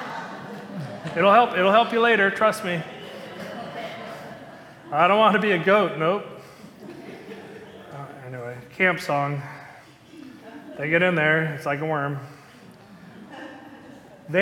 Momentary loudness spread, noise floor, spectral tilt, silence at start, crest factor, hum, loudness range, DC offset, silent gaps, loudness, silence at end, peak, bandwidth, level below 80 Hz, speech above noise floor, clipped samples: 24 LU; -47 dBFS; -6 dB/octave; 0 s; 20 dB; none; 8 LU; under 0.1%; none; -21 LUFS; 0 s; -4 dBFS; 17 kHz; -68 dBFS; 27 dB; under 0.1%